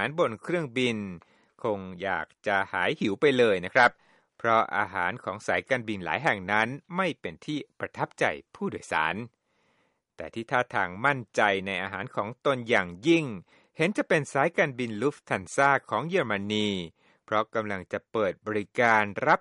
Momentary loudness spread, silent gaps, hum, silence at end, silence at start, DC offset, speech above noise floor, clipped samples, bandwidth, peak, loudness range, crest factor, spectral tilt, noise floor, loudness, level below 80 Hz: 11 LU; none; none; 0 s; 0 s; under 0.1%; 44 dB; under 0.1%; 11.5 kHz; -6 dBFS; 5 LU; 22 dB; -5 dB/octave; -71 dBFS; -27 LUFS; -68 dBFS